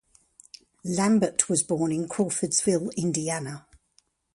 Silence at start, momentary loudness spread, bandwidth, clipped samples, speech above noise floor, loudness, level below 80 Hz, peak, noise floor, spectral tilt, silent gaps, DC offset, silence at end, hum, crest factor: 0.85 s; 10 LU; 11.5 kHz; under 0.1%; 42 dB; -25 LUFS; -64 dBFS; -2 dBFS; -67 dBFS; -4.5 dB/octave; none; under 0.1%; 0.75 s; none; 26 dB